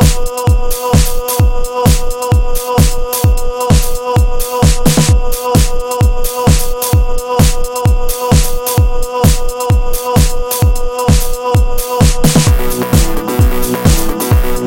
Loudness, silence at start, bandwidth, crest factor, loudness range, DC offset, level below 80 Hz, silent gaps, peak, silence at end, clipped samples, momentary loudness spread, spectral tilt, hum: -13 LUFS; 0 s; 17 kHz; 10 dB; 1 LU; under 0.1%; -14 dBFS; none; 0 dBFS; 0 s; 0.3%; 4 LU; -5 dB/octave; none